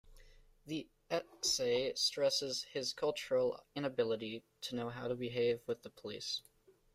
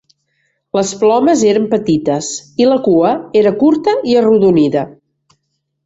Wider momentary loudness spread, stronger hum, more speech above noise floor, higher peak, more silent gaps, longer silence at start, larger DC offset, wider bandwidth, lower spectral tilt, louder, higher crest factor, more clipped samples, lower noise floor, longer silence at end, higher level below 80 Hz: first, 12 LU vs 8 LU; neither; second, 24 dB vs 57 dB; second, -22 dBFS vs -2 dBFS; neither; second, 0.05 s vs 0.75 s; neither; first, 15.5 kHz vs 8 kHz; second, -3 dB/octave vs -5.5 dB/octave; second, -37 LUFS vs -12 LUFS; about the same, 16 dB vs 12 dB; neither; second, -62 dBFS vs -69 dBFS; second, 0.55 s vs 0.95 s; second, -68 dBFS vs -52 dBFS